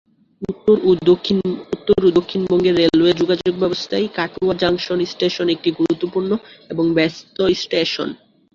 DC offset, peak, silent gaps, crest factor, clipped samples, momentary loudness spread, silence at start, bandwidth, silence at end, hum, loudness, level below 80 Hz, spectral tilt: under 0.1%; -2 dBFS; none; 16 dB; under 0.1%; 9 LU; 0.4 s; 7.2 kHz; 0.4 s; none; -18 LUFS; -50 dBFS; -6 dB/octave